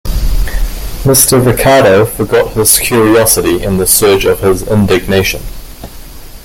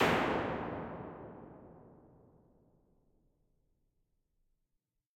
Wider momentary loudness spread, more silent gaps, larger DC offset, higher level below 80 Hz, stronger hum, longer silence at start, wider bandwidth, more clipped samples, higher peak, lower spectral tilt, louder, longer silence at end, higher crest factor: second, 12 LU vs 25 LU; neither; neither; first, -20 dBFS vs -62 dBFS; neither; about the same, 0.05 s vs 0 s; first, over 20 kHz vs 16 kHz; first, 0.3% vs under 0.1%; first, 0 dBFS vs -16 dBFS; second, -4 dB/octave vs -5.5 dB/octave; first, -9 LUFS vs -36 LUFS; second, 0.05 s vs 3.25 s; second, 10 dB vs 24 dB